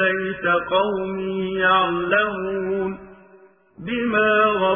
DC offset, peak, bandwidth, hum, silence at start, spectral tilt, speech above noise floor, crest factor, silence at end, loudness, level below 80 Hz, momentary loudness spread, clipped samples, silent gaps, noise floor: under 0.1%; -6 dBFS; 3.6 kHz; none; 0 s; -9 dB/octave; 31 dB; 16 dB; 0 s; -20 LUFS; -54 dBFS; 9 LU; under 0.1%; none; -51 dBFS